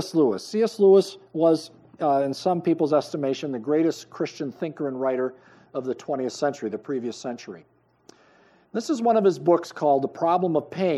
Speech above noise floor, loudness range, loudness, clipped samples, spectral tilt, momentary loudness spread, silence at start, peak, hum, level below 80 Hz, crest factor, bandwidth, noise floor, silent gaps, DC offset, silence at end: 34 dB; 8 LU; -24 LUFS; under 0.1%; -6.5 dB/octave; 12 LU; 0 s; -6 dBFS; none; -78 dBFS; 18 dB; 12.5 kHz; -58 dBFS; none; under 0.1%; 0 s